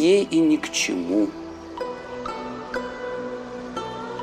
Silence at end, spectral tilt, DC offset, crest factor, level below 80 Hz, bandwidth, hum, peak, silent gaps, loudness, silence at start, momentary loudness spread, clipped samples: 0 s; -4 dB/octave; under 0.1%; 16 dB; -54 dBFS; 15 kHz; none; -8 dBFS; none; -25 LUFS; 0 s; 13 LU; under 0.1%